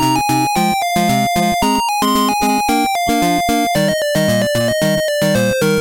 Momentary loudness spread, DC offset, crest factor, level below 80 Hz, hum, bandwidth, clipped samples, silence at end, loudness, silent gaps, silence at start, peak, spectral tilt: 1 LU; under 0.1%; 12 dB; -40 dBFS; none; 17 kHz; under 0.1%; 0 s; -15 LUFS; none; 0 s; -2 dBFS; -4 dB/octave